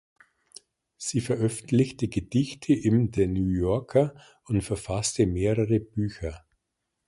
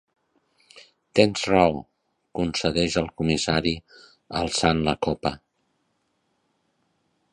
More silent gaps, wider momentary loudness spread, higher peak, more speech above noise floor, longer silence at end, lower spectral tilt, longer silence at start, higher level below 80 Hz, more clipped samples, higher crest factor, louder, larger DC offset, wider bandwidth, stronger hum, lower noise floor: neither; second, 7 LU vs 12 LU; second, -8 dBFS vs -2 dBFS; first, 56 dB vs 49 dB; second, 0.7 s vs 1.95 s; first, -6.5 dB/octave vs -4.5 dB/octave; first, 1 s vs 0.75 s; about the same, -44 dBFS vs -46 dBFS; neither; second, 18 dB vs 24 dB; second, -26 LUFS vs -23 LUFS; neither; about the same, 11.5 kHz vs 11 kHz; neither; first, -81 dBFS vs -72 dBFS